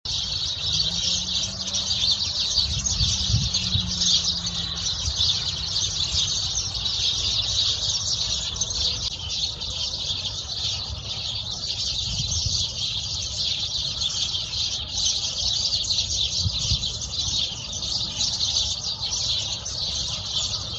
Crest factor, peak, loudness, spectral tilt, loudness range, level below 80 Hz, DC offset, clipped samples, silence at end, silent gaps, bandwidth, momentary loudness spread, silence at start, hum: 18 dB; -8 dBFS; -23 LUFS; -1 dB/octave; 4 LU; -40 dBFS; under 0.1%; under 0.1%; 0 s; none; 8.8 kHz; 5 LU; 0.05 s; none